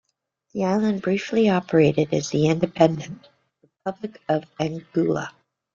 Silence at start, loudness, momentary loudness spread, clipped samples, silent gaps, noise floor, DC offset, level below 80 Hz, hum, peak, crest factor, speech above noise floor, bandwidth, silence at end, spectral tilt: 0.55 s; -22 LUFS; 15 LU; under 0.1%; none; -73 dBFS; under 0.1%; -60 dBFS; none; -2 dBFS; 20 dB; 52 dB; 7.6 kHz; 0.45 s; -6.5 dB/octave